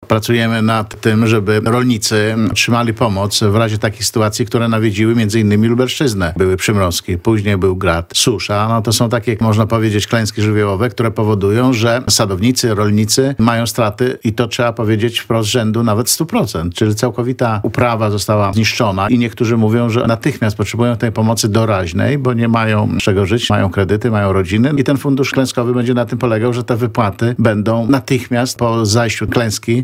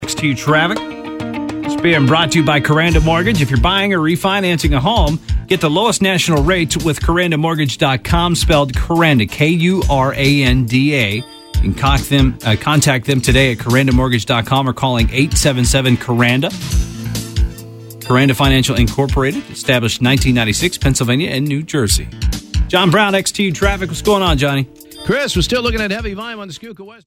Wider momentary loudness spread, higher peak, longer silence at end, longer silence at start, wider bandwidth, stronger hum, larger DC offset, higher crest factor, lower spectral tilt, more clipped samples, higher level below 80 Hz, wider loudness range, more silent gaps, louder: second, 3 LU vs 9 LU; about the same, 0 dBFS vs 0 dBFS; second, 0 s vs 0.15 s; about the same, 0 s vs 0 s; about the same, 16 kHz vs 17 kHz; neither; neither; about the same, 14 dB vs 14 dB; about the same, -5 dB/octave vs -5 dB/octave; neither; second, -42 dBFS vs -24 dBFS; about the same, 1 LU vs 2 LU; neither; about the same, -14 LUFS vs -14 LUFS